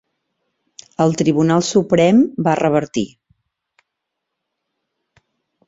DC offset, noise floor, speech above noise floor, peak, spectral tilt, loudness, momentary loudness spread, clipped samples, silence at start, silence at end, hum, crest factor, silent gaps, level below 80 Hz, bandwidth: under 0.1%; -78 dBFS; 64 dB; -2 dBFS; -6 dB/octave; -16 LUFS; 11 LU; under 0.1%; 1 s; 2.6 s; none; 18 dB; none; -56 dBFS; 8 kHz